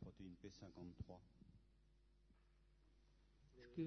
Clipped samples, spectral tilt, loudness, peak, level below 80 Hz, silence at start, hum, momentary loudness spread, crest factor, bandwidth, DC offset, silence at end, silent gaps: under 0.1%; -7.5 dB/octave; -60 LUFS; -36 dBFS; -70 dBFS; 0 s; none; 6 LU; 22 dB; 6.2 kHz; under 0.1%; 0 s; none